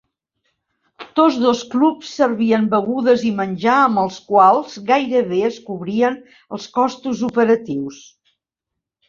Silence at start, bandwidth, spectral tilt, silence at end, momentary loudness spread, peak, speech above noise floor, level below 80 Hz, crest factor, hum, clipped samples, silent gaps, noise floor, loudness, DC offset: 1 s; 7.4 kHz; -6 dB/octave; 1.15 s; 10 LU; -2 dBFS; 65 dB; -62 dBFS; 16 dB; none; under 0.1%; none; -82 dBFS; -17 LUFS; under 0.1%